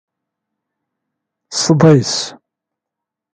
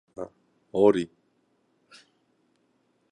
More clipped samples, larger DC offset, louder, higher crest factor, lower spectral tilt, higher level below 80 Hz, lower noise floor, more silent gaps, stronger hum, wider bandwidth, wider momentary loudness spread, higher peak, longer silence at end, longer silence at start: neither; neither; first, -13 LUFS vs -24 LUFS; about the same, 18 dB vs 22 dB; second, -5 dB/octave vs -7 dB/octave; first, -54 dBFS vs -66 dBFS; first, -83 dBFS vs -70 dBFS; neither; neither; about the same, 9.4 kHz vs 9.2 kHz; second, 13 LU vs 19 LU; first, 0 dBFS vs -8 dBFS; second, 1 s vs 2.05 s; first, 1.5 s vs 0.2 s